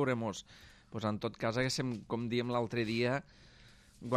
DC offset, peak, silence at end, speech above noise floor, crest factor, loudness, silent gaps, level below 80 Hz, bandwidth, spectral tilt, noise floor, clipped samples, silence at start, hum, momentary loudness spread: under 0.1%; -18 dBFS; 0 s; 24 dB; 18 dB; -35 LUFS; none; -64 dBFS; 14 kHz; -5.5 dB/octave; -60 dBFS; under 0.1%; 0 s; none; 13 LU